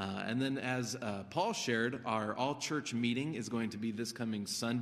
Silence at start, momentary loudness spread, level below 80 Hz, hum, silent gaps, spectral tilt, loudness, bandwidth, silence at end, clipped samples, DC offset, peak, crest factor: 0 s; 5 LU; -76 dBFS; none; none; -4.5 dB/octave; -36 LUFS; 15 kHz; 0 s; under 0.1%; under 0.1%; -18 dBFS; 18 dB